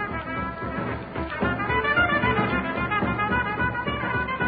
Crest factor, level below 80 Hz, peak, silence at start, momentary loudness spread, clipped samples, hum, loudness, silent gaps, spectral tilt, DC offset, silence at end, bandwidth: 16 dB; -40 dBFS; -8 dBFS; 0 s; 9 LU; under 0.1%; none; -25 LUFS; none; -10.5 dB/octave; under 0.1%; 0 s; 5 kHz